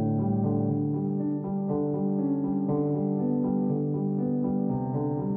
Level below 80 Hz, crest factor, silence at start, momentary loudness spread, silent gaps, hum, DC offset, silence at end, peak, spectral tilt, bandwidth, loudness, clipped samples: -58 dBFS; 10 dB; 0 s; 3 LU; none; none; under 0.1%; 0 s; -16 dBFS; -15 dB/octave; 2.1 kHz; -28 LUFS; under 0.1%